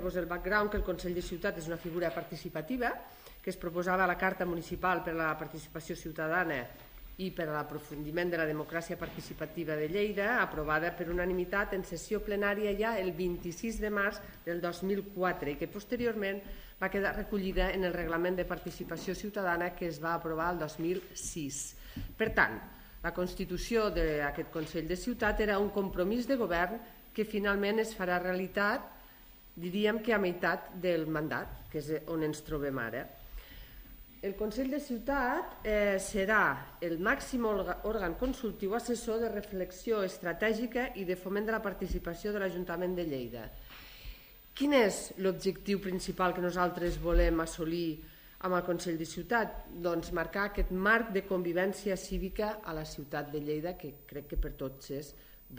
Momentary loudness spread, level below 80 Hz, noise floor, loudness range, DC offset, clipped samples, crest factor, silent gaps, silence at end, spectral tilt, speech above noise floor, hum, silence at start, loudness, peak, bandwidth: 12 LU; -46 dBFS; -55 dBFS; 4 LU; under 0.1%; under 0.1%; 22 dB; none; 0 s; -5 dB/octave; 22 dB; none; 0 s; -34 LUFS; -12 dBFS; 15.5 kHz